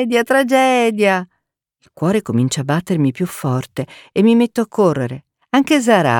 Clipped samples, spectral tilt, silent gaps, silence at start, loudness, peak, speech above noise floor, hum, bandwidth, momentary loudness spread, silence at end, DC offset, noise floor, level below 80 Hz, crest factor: under 0.1%; -5.5 dB/octave; none; 0 s; -16 LUFS; 0 dBFS; 56 dB; none; 19 kHz; 10 LU; 0 s; under 0.1%; -71 dBFS; -58 dBFS; 16 dB